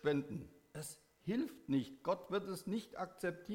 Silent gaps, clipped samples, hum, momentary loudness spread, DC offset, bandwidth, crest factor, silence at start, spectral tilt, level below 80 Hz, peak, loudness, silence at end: none; under 0.1%; none; 11 LU; under 0.1%; 17 kHz; 18 dB; 0 s; -6 dB/octave; -72 dBFS; -24 dBFS; -42 LUFS; 0 s